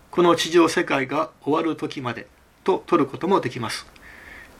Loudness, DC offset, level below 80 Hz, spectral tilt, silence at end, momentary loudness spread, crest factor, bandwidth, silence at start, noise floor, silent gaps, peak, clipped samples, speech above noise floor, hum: -22 LUFS; under 0.1%; -58 dBFS; -5 dB/octave; 0.15 s; 13 LU; 20 dB; 15 kHz; 0.15 s; -43 dBFS; none; -4 dBFS; under 0.1%; 22 dB; none